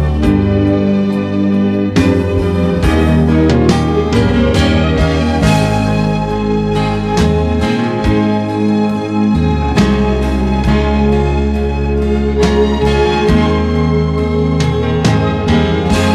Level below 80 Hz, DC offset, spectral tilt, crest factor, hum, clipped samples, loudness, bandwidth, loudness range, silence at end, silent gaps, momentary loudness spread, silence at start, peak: -20 dBFS; under 0.1%; -7 dB/octave; 12 dB; none; under 0.1%; -13 LUFS; 12.5 kHz; 2 LU; 0 s; none; 3 LU; 0 s; 0 dBFS